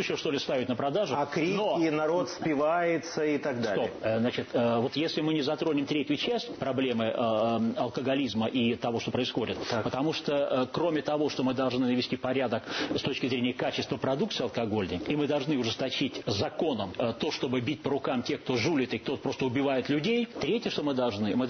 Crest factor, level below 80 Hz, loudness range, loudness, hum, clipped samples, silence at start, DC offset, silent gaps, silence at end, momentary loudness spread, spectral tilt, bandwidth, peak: 12 dB; -62 dBFS; 2 LU; -29 LUFS; none; under 0.1%; 0 s; under 0.1%; none; 0 s; 4 LU; -5.5 dB/octave; 6.6 kHz; -16 dBFS